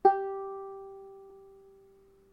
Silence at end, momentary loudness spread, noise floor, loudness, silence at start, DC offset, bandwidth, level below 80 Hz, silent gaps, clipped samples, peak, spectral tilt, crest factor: 0.85 s; 23 LU; -60 dBFS; -34 LUFS; 0.05 s; under 0.1%; 5.4 kHz; -72 dBFS; none; under 0.1%; -10 dBFS; -7 dB/octave; 24 dB